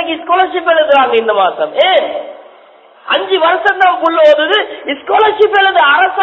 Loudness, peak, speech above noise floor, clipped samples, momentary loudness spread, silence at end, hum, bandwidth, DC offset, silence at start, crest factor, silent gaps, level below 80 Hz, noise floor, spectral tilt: -10 LUFS; 0 dBFS; 31 dB; 0.2%; 7 LU; 0 s; none; 8 kHz; under 0.1%; 0 s; 10 dB; none; -58 dBFS; -41 dBFS; -3.5 dB/octave